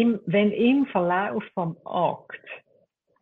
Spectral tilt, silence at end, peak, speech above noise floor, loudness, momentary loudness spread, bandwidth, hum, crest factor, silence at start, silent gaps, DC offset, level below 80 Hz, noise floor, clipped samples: -9.5 dB/octave; 0.65 s; -10 dBFS; 42 dB; -24 LUFS; 19 LU; 4.1 kHz; none; 16 dB; 0 s; none; under 0.1%; -68 dBFS; -66 dBFS; under 0.1%